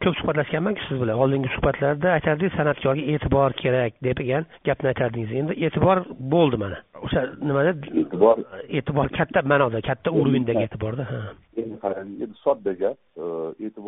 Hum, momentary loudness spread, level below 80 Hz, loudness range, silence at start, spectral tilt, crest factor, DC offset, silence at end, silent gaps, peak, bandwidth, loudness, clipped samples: none; 10 LU; -46 dBFS; 3 LU; 0 s; -5.5 dB/octave; 18 dB; under 0.1%; 0 s; none; -4 dBFS; 3.9 kHz; -23 LUFS; under 0.1%